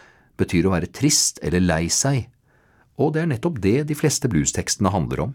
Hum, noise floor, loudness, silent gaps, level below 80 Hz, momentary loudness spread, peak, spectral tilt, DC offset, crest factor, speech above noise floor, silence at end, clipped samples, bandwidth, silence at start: none; -58 dBFS; -21 LUFS; none; -42 dBFS; 6 LU; -4 dBFS; -4.5 dB/octave; under 0.1%; 18 dB; 38 dB; 0 s; under 0.1%; 17.5 kHz; 0.4 s